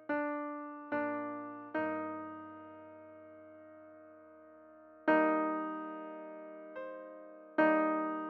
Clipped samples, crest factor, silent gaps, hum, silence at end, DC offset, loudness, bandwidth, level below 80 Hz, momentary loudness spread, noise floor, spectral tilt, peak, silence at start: under 0.1%; 22 dB; none; none; 0 s; under 0.1%; -35 LUFS; 4.7 kHz; -84 dBFS; 25 LU; -57 dBFS; -8 dB/octave; -16 dBFS; 0 s